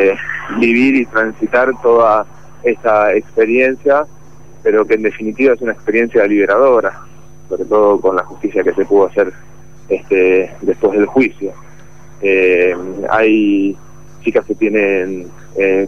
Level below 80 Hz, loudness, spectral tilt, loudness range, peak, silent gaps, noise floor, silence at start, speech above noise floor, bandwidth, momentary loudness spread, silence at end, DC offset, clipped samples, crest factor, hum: -48 dBFS; -13 LUFS; -6.5 dB/octave; 2 LU; -2 dBFS; none; -40 dBFS; 0 s; 27 dB; 7.4 kHz; 10 LU; 0 s; 2%; under 0.1%; 12 dB; none